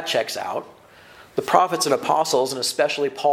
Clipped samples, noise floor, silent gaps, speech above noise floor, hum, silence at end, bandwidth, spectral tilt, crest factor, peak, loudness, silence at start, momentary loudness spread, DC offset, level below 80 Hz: under 0.1%; -47 dBFS; none; 26 dB; none; 0 s; 17 kHz; -2.5 dB/octave; 22 dB; 0 dBFS; -21 LUFS; 0 s; 10 LU; under 0.1%; -68 dBFS